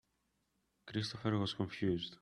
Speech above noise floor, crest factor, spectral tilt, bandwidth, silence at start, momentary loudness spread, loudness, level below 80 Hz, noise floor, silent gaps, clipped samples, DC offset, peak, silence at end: 44 dB; 20 dB; -6 dB/octave; 11 kHz; 0.85 s; 4 LU; -38 LUFS; -70 dBFS; -81 dBFS; none; under 0.1%; under 0.1%; -20 dBFS; 0.05 s